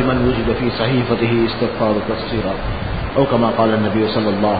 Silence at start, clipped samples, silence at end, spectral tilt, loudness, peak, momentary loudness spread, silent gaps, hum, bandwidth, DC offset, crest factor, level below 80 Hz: 0 s; under 0.1%; 0 s; -12 dB/octave; -18 LUFS; 0 dBFS; 6 LU; none; none; 5 kHz; 1%; 16 dB; -32 dBFS